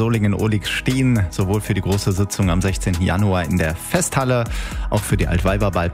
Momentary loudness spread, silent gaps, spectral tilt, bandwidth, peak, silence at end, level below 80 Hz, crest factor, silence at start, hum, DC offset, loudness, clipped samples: 3 LU; none; -5.5 dB/octave; 16 kHz; -2 dBFS; 0 s; -30 dBFS; 16 dB; 0 s; none; under 0.1%; -19 LUFS; under 0.1%